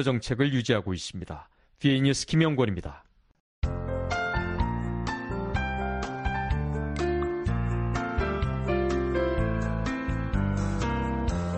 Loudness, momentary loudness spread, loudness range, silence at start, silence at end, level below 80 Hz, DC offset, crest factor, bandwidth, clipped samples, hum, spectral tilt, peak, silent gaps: -28 LUFS; 8 LU; 3 LU; 0 s; 0 s; -36 dBFS; under 0.1%; 20 dB; 10.5 kHz; under 0.1%; none; -6 dB/octave; -8 dBFS; 3.40-3.62 s